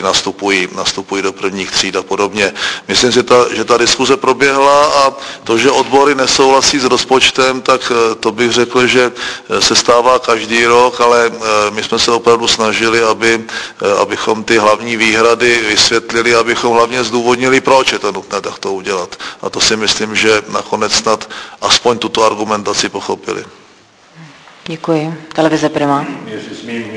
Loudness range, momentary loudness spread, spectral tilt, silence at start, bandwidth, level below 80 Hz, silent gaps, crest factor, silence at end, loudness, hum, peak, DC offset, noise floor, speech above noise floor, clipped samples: 5 LU; 11 LU; -2.5 dB/octave; 0 s; 11 kHz; -46 dBFS; none; 12 dB; 0 s; -11 LUFS; none; 0 dBFS; under 0.1%; -44 dBFS; 32 dB; 0.2%